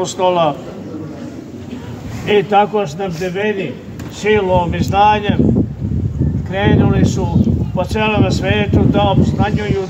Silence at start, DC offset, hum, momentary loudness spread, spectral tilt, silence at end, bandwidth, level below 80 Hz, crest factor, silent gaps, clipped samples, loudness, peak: 0 s; under 0.1%; none; 16 LU; -7 dB/octave; 0 s; 16 kHz; -30 dBFS; 14 dB; none; under 0.1%; -15 LUFS; 0 dBFS